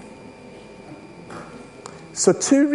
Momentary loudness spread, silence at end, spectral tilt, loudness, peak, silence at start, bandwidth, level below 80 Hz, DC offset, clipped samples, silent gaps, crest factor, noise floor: 24 LU; 0 s; -4 dB/octave; -19 LUFS; -2 dBFS; 0 s; 11.5 kHz; -60 dBFS; under 0.1%; under 0.1%; none; 22 dB; -42 dBFS